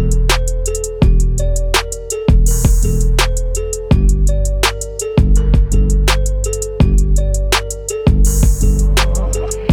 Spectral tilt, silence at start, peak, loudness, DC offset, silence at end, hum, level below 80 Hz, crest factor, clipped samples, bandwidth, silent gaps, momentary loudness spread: -4.5 dB/octave; 0 s; -2 dBFS; -15 LUFS; under 0.1%; 0 s; none; -14 dBFS; 12 dB; under 0.1%; 16 kHz; none; 6 LU